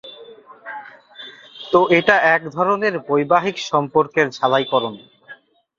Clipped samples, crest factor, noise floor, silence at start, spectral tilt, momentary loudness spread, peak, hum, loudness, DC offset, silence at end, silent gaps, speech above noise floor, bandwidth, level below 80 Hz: under 0.1%; 18 dB; -45 dBFS; 0.05 s; -5 dB/octave; 23 LU; 0 dBFS; none; -17 LUFS; under 0.1%; 0.45 s; none; 28 dB; 7.6 kHz; -62 dBFS